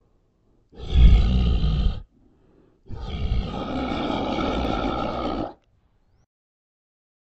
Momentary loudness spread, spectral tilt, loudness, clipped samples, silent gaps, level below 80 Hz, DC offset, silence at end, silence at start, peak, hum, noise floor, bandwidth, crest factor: 17 LU; -8 dB/octave; -24 LUFS; under 0.1%; none; -26 dBFS; under 0.1%; 1.7 s; 0.75 s; -4 dBFS; none; -63 dBFS; 6.4 kHz; 20 dB